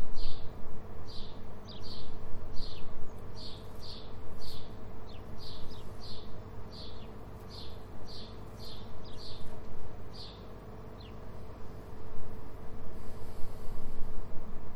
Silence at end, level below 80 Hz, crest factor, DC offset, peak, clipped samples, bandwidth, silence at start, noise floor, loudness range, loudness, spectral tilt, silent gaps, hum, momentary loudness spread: 0 s; -42 dBFS; 14 dB; under 0.1%; -12 dBFS; under 0.1%; 5.6 kHz; 0 s; -46 dBFS; 2 LU; -47 LUFS; -6 dB/octave; none; none; 3 LU